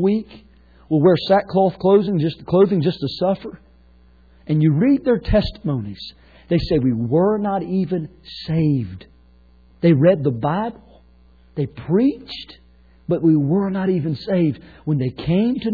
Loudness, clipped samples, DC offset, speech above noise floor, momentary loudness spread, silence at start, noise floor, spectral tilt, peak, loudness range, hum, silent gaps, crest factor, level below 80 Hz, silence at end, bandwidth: -19 LUFS; under 0.1%; under 0.1%; 32 dB; 15 LU; 0 s; -51 dBFS; -10 dB/octave; -4 dBFS; 4 LU; none; none; 14 dB; -40 dBFS; 0 s; 4.9 kHz